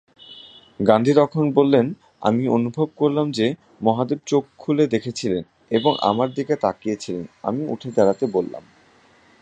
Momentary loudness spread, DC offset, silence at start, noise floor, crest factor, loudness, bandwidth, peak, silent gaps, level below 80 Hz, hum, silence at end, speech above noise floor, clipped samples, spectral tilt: 10 LU; under 0.1%; 0.3 s; -54 dBFS; 20 dB; -21 LUFS; 9.4 kHz; -2 dBFS; none; -60 dBFS; none; 0.8 s; 34 dB; under 0.1%; -6.5 dB/octave